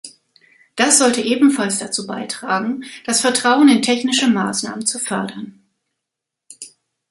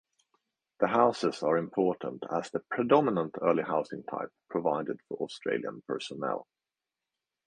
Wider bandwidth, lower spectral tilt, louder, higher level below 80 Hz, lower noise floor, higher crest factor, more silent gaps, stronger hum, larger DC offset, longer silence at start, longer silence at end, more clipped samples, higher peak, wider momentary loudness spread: first, 11.5 kHz vs 10 kHz; second, -2.5 dB/octave vs -6 dB/octave; first, -16 LUFS vs -31 LUFS; first, -64 dBFS vs -74 dBFS; second, -82 dBFS vs under -90 dBFS; about the same, 18 dB vs 22 dB; neither; neither; neither; second, 0.05 s vs 0.8 s; second, 0.45 s vs 1.05 s; neither; first, 0 dBFS vs -8 dBFS; first, 21 LU vs 12 LU